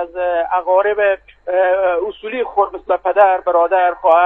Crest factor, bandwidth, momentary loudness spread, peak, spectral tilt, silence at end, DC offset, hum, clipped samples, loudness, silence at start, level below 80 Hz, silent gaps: 14 dB; 3.9 kHz; 8 LU; 0 dBFS; -6 dB/octave; 0 s; under 0.1%; none; under 0.1%; -16 LUFS; 0 s; -52 dBFS; none